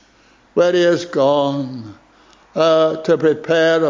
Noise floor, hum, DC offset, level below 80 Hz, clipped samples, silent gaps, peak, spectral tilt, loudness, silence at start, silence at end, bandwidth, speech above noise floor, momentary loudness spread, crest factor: -52 dBFS; none; under 0.1%; -60 dBFS; under 0.1%; none; -2 dBFS; -5.5 dB/octave; -16 LUFS; 0.55 s; 0 s; 7.6 kHz; 37 dB; 12 LU; 14 dB